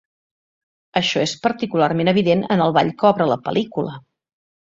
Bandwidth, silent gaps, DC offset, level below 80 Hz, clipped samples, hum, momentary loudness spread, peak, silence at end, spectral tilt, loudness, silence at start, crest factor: 7.8 kHz; none; under 0.1%; -60 dBFS; under 0.1%; none; 8 LU; -2 dBFS; 0.7 s; -5.5 dB/octave; -19 LUFS; 0.95 s; 18 dB